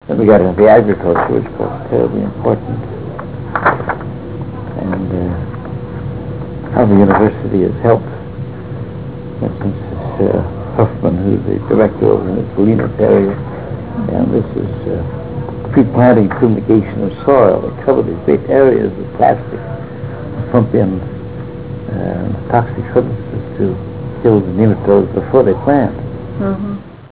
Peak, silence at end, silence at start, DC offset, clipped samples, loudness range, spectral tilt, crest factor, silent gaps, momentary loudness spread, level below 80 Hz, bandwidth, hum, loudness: 0 dBFS; 0.05 s; 0 s; 1%; under 0.1%; 6 LU; -12.5 dB/octave; 14 dB; none; 15 LU; -34 dBFS; 4 kHz; none; -14 LUFS